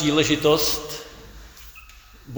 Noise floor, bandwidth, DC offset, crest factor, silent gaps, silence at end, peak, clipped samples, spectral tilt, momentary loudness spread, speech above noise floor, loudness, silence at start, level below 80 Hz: -46 dBFS; over 20 kHz; under 0.1%; 20 dB; none; 0 s; -6 dBFS; under 0.1%; -3.5 dB/octave; 24 LU; 26 dB; -20 LUFS; 0 s; -46 dBFS